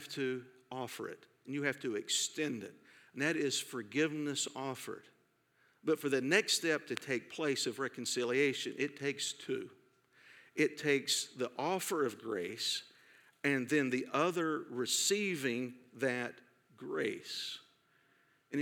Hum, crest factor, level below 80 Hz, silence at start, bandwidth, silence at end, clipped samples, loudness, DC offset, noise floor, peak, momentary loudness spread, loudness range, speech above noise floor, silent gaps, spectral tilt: none; 24 dB; under -90 dBFS; 0 s; 19 kHz; 0 s; under 0.1%; -36 LUFS; under 0.1%; -73 dBFS; -14 dBFS; 13 LU; 4 LU; 37 dB; none; -3 dB/octave